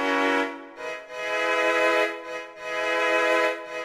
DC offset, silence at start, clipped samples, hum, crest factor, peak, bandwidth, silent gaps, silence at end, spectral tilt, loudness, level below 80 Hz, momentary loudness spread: under 0.1%; 0 s; under 0.1%; none; 16 dB; -10 dBFS; 15 kHz; none; 0 s; -2 dB/octave; -24 LUFS; -68 dBFS; 14 LU